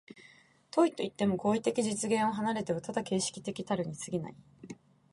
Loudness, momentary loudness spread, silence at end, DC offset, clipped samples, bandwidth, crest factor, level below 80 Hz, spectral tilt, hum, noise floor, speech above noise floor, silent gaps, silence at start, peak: -32 LUFS; 16 LU; 0.4 s; under 0.1%; under 0.1%; 11.5 kHz; 20 dB; -68 dBFS; -5 dB/octave; none; -61 dBFS; 29 dB; none; 0.15 s; -14 dBFS